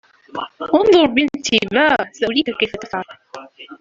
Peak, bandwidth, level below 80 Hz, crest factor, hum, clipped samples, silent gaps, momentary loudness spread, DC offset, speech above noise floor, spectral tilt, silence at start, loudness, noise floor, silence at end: -2 dBFS; 7.8 kHz; -52 dBFS; 16 dB; none; under 0.1%; none; 20 LU; under 0.1%; 20 dB; -3.5 dB/octave; 0.35 s; -16 LUFS; -37 dBFS; 0.05 s